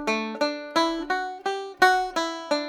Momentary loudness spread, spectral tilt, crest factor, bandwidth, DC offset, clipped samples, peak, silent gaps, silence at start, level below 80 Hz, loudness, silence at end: 9 LU; -2.5 dB/octave; 22 dB; 17.5 kHz; under 0.1%; under 0.1%; -4 dBFS; none; 0 s; -58 dBFS; -25 LUFS; 0 s